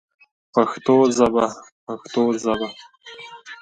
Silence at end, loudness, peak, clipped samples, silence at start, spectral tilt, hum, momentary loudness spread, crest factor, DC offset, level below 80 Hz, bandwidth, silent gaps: 0.05 s; -20 LUFS; -2 dBFS; under 0.1%; 0.55 s; -5 dB/octave; none; 22 LU; 20 dB; under 0.1%; -58 dBFS; 9.2 kHz; 1.72-1.87 s